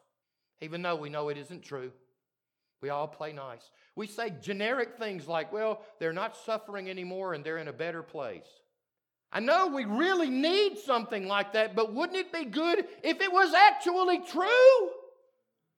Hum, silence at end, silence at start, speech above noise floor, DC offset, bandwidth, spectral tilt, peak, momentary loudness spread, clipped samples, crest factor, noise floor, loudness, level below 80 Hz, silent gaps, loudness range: none; 0.7 s; 0.6 s; 60 dB; under 0.1%; 13 kHz; -4.5 dB/octave; -6 dBFS; 20 LU; under 0.1%; 24 dB; -89 dBFS; -28 LUFS; under -90 dBFS; none; 14 LU